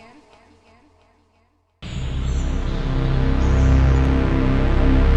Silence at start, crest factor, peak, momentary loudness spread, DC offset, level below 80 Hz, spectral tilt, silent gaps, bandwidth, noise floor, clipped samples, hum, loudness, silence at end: 1.8 s; 12 dB; -6 dBFS; 11 LU; under 0.1%; -20 dBFS; -7.5 dB/octave; none; 8 kHz; -62 dBFS; under 0.1%; none; -20 LUFS; 0 s